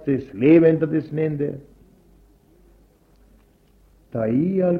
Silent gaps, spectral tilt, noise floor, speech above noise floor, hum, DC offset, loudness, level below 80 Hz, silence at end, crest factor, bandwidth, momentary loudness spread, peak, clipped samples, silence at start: none; -10.5 dB/octave; -56 dBFS; 37 dB; 50 Hz at -55 dBFS; under 0.1%; -20 LUFS; -54 dBFS; 0 s; 18 dB; 4.6 kHz; 14 LU; -4 dBFS; under 0.1%; 0 s